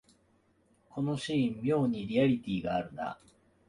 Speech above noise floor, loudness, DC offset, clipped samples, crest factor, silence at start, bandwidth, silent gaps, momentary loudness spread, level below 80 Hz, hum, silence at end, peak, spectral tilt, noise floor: 38 dB; -32 LUFS; under 0.1%; under 0.1%; 16 dB; 0.95 s; 11 kHz; none; 12 LU; -62 dBFS; none; 0.55 s; -16 dBFS; -7 dB/octave; -69 dBFS